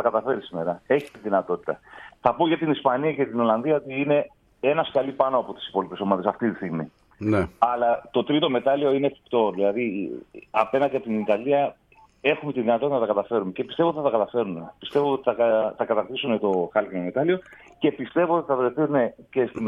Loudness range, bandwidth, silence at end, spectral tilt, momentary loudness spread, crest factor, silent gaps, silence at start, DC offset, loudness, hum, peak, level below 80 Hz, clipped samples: 2 LU; 9.6 kHz; 0 s; -8 dB/octave; 7 LU; 20 dB; none; 0 s; under 0.1%; -24 LUFS; none; -4 dBFS; -60 dBFS; under 0.1%